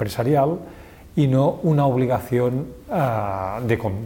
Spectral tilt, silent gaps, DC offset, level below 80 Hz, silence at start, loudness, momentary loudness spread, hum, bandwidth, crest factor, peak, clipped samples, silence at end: -8 dB/octave; none; under 0.1%; -48 dBFS; 0 s; -21 LUFS; 9 LU; none; 17 kHz; 16 dB; -6 dBFS; under 0.1%; 0 s